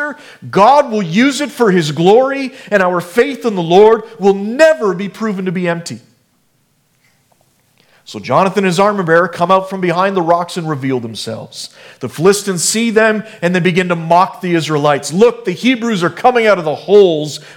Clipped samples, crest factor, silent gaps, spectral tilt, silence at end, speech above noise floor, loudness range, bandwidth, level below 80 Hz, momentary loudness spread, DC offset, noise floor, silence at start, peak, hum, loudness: 0.1%; 14 dB; none; -5 dB/octave; 0.05 s; 46 dB; 6 LU; 17 kHz; -58 dBFS; 13 LU; under 0.1%; -58 dBFS; 0 s; 0 dBFS; none; -13 LUFS